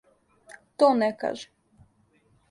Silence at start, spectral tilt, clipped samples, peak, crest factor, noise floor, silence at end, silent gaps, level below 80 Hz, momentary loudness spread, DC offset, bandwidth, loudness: 0.5 s; -5 dB/octave; under 0.1%; -6 dBFS; 22 dB; -65 dBFS; 1.05 s; none; -70 dBFS; 24 LU; under 0.1%; 11.5 kHz; -24 LUFS